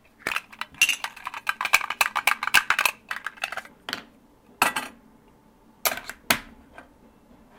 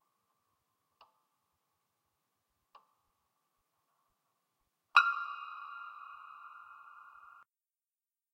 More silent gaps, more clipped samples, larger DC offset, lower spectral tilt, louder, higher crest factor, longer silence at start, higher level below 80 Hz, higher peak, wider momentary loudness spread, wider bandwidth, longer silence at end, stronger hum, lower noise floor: neither; neither; neither; first, 0 dB/octave vs 2.5 dB/octave; first, -25 LUFS vs -32 LUFS; second, 24 dB vs 34 dB; second, 0.25 s vs 4.95 s; first, -60 dBFS vs under -90 dBFS; first, -4 dBFS vs -8 dBFS; second, 14 LU vs 27 LU; first, 19 kHz vs 13.5 kHz; second, 0.75 s vs 1.25 s; neither; second, -56 dBFS vs under -90 dBFS